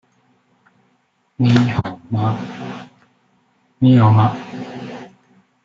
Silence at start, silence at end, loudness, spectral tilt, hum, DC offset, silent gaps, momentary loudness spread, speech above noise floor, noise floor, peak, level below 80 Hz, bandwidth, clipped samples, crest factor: 1.4 s; 0.6 s; -16 LUFS; -8.5 dB/octave; none; under 0.1%; none; 20 LU; 48 dB; -63 dBFS; -2 dBFS; -54 dBFS; 7.4 kHz; under 0.1%; 18 dB